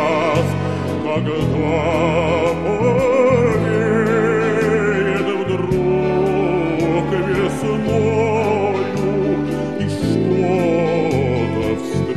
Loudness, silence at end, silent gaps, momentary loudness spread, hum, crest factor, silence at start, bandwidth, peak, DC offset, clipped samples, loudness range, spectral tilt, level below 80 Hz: -17 LUFS; 0 s; none; 5 LU; none; 14 dB; 0 s; 13 kHz; -2 dBFS; 0.7%; under 0.1%; 2 LU; -7 dB/octave; -40 dBFS